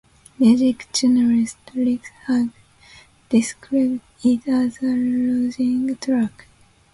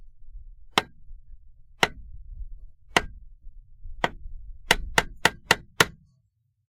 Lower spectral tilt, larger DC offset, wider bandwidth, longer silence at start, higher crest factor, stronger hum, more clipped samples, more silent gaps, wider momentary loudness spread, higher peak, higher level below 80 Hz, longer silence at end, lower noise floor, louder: first, -5 dB/octave vs -2 dB/octave; neither; second, 11.5 kHz vs 16 kHz; first, 0.4 s vs 0 s; second, 16 dB vs 28 dB; neither; neither; neither; second, 7 LU vs 25 LU; about the same, -4 dBFS vs -2 dBFS; second, -56 dBFS vs -42 dBFS; about the same, 0.65 s vs 0.75 s; second, -49 dBFS vs -70 dBFS; first, -20 LUFS vs -25 LUFS